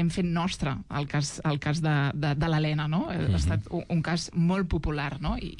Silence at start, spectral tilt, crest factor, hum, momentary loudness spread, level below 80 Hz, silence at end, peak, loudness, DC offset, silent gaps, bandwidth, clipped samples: 0 s; -6 dB/octave; 10 dB; none; 5 LU; -40 dBFS; 0 s; -18 dBFS; -28 LUFS; under 0.1%; none; 11 kHz; under 0.1%